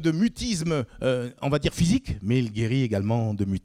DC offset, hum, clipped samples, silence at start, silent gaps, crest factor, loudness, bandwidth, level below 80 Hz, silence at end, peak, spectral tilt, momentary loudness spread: under 0.1%; none; under 0.1%; 0 s; none; 14 dB; -25 LUFS; 15.5 kHz; -44 dBFS; 0.05 s; -10 dBFS; -6 dB/octave; 3 LU